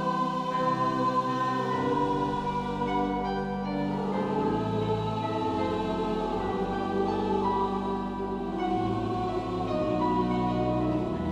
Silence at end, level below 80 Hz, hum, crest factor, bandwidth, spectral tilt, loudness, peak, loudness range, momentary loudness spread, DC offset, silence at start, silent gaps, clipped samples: 0 s; -46 dBFS; none; 14 dB; 10.5 kHz; -7.5 dB/octave; -29 LUFS; -14 dBFS; 1 LU; 4 LU; under 0.1%; 0 s; none; under 0.1%